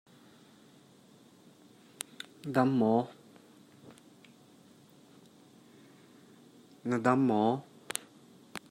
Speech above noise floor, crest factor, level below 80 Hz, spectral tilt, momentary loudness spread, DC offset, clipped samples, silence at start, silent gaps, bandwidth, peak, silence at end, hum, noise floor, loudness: 32 dB; 26 dB; -80 dBFS; -6 dB/octave; 20 LU; under 0.1%; under 0.1%; 2.45 s; none; 16 kHz; -8 dBFS; 0.1 s; none; -59 dBFS; -31 LUFS